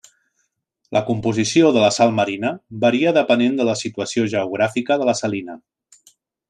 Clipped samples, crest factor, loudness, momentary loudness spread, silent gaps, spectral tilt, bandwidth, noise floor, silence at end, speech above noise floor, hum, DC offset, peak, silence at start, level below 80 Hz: under 0.1%; 16 dB; -18 LUFS; 9 LU; none; -5 dB/octave; 10.5 kHz; -71 dBFS; 0.95 s; 53 dB; none; under 0.1%; -2 dBFS; 0.9 s; -62 dBFS